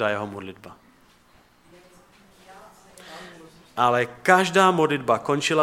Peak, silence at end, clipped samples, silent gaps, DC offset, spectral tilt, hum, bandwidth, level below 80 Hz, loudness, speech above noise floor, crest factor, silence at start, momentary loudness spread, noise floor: -2 dBFS; 0 s; under 0.1%; none; under 0.1%; -4.5 dB/octave; none; 16 kHz; -66 dBFS; -21 LUFS; 36 dB; 24 dB; 0 s; 23 LU; -57 dBFS